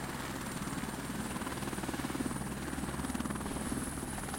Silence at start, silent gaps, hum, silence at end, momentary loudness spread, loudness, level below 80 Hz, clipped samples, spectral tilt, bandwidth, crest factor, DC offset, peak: 0 s; none; none; 0 s; 2 LU; -38 LUFS; -50 dBFS; under 0.1%; -4.5 dB/octave; 16.5 kHz; 18 dB; under 0.1%; -20 dBFS